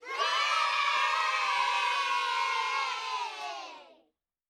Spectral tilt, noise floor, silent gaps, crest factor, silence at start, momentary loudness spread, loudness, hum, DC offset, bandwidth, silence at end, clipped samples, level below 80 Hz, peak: 2.5 dB/octave; -73 dBFS; none; 14 dB; 0 s; 11 LU; -28 LUFS; none; under 0.1%; 15 kHz; 0.65 s; under 0.1%; -78 dBFS; -16 dBFS